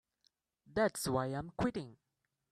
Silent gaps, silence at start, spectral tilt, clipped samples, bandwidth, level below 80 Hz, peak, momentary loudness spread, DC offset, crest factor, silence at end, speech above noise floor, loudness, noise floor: none; 0.75 s; -5 dB/octave; under 0.1%; 15.5 kHz; -62 dBFS; -20 dBFS; 11 LU; under 0.1%; 18 dB; 0.6 s; 42 dB; -37 LUFS; -78 dBFS